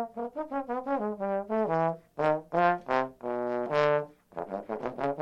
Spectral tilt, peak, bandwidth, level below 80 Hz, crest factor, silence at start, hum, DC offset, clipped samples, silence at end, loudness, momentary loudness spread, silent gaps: -7.5 dB/octave; -10 dBFS; 8 kHz; -68 dBFS; 20 dB; 0 s; none; under 0.1%; under 0.1%; 0 s; -30 LUFS; 10 LU; none